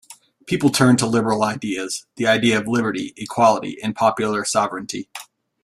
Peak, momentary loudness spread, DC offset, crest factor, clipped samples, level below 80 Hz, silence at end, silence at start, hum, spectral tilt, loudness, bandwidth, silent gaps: -2 dBFS; 12 LU; under 0.1%; 18 dB; under 0.1%; -58 dBFS; 0.4 s; 0.1 s; none; -4.5 dB/octave; -19 LUFS; 14.5 kHz; none